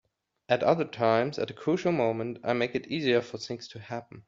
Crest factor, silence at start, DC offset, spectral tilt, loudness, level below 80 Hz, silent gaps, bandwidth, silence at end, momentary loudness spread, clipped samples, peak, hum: 20 dB; 0.5 s; under 0.1%; -4.5 dB/octave; -28 LUFS; -68 dBFS; none; 7.6 kHz; 0.05 s; 13 LU; under 0.1%; -10 dBFS; none